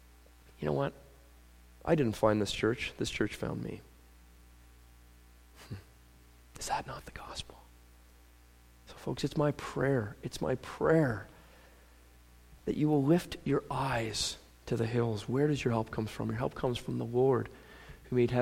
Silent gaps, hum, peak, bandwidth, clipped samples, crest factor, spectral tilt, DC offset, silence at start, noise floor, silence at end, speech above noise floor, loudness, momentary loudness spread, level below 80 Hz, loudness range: none; 60 Hz at -60 dBFS; -12 dBFS; 16.5 kHz; under 0.1%; 22 dB; -6 dB/octave; under 0.1%; 0.6 s; -59 dBFS; 0 s; 27 dB; -33 LUFS; 16 LU; -54 dBFS; 11 LU